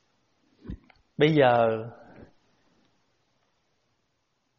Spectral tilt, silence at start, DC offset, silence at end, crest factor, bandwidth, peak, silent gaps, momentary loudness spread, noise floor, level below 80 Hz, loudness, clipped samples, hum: -5 dB/octave; 0.7 s; under 0.1%; 2.7 s; 22 dB; 6.2 kHz; -6 dBFS; none; 24 LU; -75 dBFS; -56 dBFS; -23 LUFS; under 0.1%; none